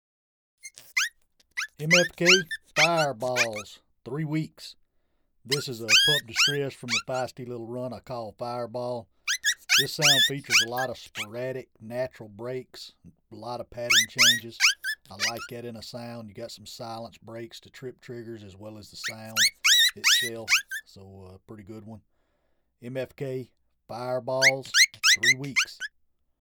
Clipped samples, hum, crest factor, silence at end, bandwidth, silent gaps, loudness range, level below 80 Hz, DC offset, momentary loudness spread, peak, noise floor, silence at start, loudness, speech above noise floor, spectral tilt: under 0.1%; none; 24 dB; 0.65 s; over 20 kHz; none; 12 LU; -68 dBFS; under 0.1%; 23 LU; -4 dBFS; -71 dBFS; 0.65 s; -23 LUFS; 44 dB; -1.5 dB/octave